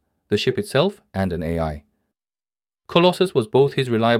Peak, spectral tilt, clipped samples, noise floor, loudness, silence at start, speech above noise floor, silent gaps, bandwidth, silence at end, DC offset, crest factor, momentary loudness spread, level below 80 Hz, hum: -2 dBFS; -6 dB/octave; under 0.1%; under -90 dBFS; -20 LUFS; 0.3 s; over 71 dB; none; 15.5 kHz; 0 s; under 0.1%; 20 dB; 8 LU; -44 dBFS; none